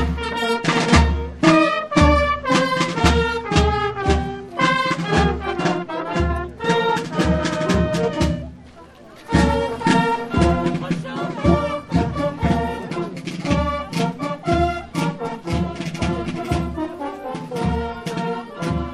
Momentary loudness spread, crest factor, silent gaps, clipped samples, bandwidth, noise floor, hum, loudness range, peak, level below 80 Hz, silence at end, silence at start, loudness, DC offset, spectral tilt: 10 LU; 18 dB; none; under 0.1%; 13 kHz; -43 dBFS; none; 7 LU; -2 dBFS; -30 dBFS; 0 s; 0 s; -20 LUFS; under 0.1%; -6 dB/octave